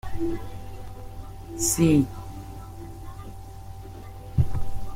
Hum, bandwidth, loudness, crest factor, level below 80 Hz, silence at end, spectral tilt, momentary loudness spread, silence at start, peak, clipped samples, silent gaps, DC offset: none; 16.5 kHz; -25 LUFS; 18 dB; -38 dBFS; 0 s; -5.5 dB/octave; 21 LU; 0.05 s; -10 dBFS; under 0.1%; none; under 0.1%